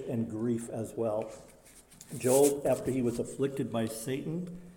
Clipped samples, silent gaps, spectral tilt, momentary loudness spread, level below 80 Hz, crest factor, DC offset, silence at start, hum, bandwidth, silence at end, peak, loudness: under 0.1%; none; -5.5 dB/octave; 14 LU; -62 dBFS; 20 dB; under 0.1%; 0 s; none; 17 kHz; 0 s; -12 dBFS; -31 LUFS